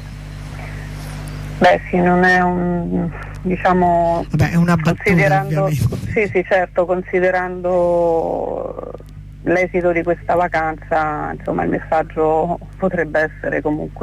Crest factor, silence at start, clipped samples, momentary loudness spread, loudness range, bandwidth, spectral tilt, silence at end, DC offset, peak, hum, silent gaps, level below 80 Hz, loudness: 14 dB; 0 s; under 0.1%; 15 LU; 3 LU; 14 kHz; -7.5 dB/octave; 0 s; under 0.1%; -4 dBFS; 50 Hz at -35 dBFS; none; -36 dBFS; -17 LUFS